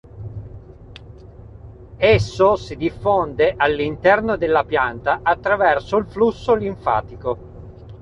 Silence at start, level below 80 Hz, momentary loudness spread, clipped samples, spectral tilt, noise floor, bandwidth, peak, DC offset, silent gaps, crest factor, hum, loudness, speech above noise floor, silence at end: 0.15 s; -40 dBFS; 18 LU; under 0.1%; -6.5 dB/octave; -40 dBFS; 8.2 kHz; -2 dBFS; under 0.1%; none; 16 dB; none; -19 LUFS; 22 dB; 0 s